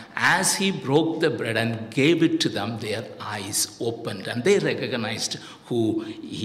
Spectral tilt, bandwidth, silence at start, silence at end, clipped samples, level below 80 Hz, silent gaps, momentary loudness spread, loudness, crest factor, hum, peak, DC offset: -4 dB/octave; 16 kHz; 0 s; 0 s; under 0.1%; -68 dBFS; none; 11 LU; -24 LUFS; 16 dB; none; -8 dBFS; under 0.1%